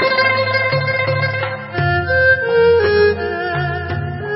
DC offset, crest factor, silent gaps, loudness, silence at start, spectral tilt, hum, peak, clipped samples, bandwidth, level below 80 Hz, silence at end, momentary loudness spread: under 0.1%; 12 dB; none; -15 LUFS; 0 s; -10 dB/octave; none; -4 dBFS; under 0.1%; 5.8 kHz; -36 dBFS; 0 s; 9 LU